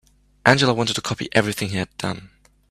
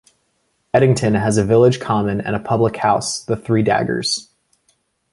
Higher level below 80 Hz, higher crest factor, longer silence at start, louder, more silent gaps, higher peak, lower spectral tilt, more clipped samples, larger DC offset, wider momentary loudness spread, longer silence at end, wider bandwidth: second, -52 dBFS vs -46 dBFS; about the same, 22 dB vs 18 dB; second, 0.45 s vs 0.75 s; second, -21 LUFS vs -17 LUFS; neither; about the same, 0 dBFS vs 0 dBFS; about the same, -4.5 dB/octave vs -5.5 dB/octave; neither; neither; first, 13 LU vs 8 LU; second, 0.45 s vs 0.9 s; first, 15 kHz vs 11.5 kHz